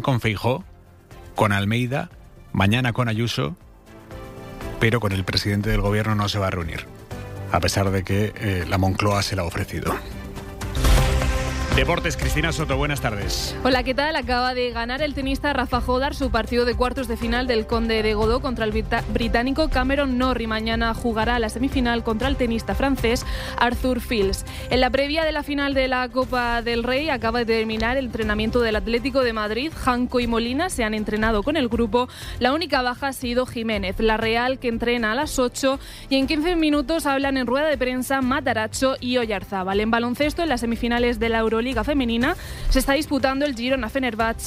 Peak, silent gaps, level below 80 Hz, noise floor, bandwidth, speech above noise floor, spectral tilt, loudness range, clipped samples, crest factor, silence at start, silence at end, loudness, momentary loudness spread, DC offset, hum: -6 dBFS; none; -32 dBFS; -45 dBFS; 16 kHz; 23 dB; -5 dB/octave; 2 LU; under 0.1%; 16 dB; 0 s; 0 s; -22 LUFS; 5 LU; under 0.1%; none